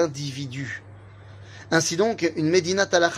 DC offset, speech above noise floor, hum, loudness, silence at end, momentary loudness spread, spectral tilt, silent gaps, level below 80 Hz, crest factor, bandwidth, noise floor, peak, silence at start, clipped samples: under 0.1%; 21 dB; none; -23 LUFS; 0 s; 15 LU; -4 dB/octave; none; -62 dBFS; 20 dB; 15.5 kHz; -44 dBFS; -4 dBFS; 0 s; under 0.1%